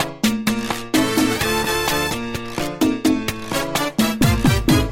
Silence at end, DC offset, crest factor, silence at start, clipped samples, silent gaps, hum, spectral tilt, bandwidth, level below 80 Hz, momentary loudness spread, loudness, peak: 0 s; under 0.1%; 14 dB; 0 s; under 0.1%; none; none; -4.5 dB/octave; 16.5 kHz; -32 dBFS; 7 LU; -19 LUFS; -4 dBFS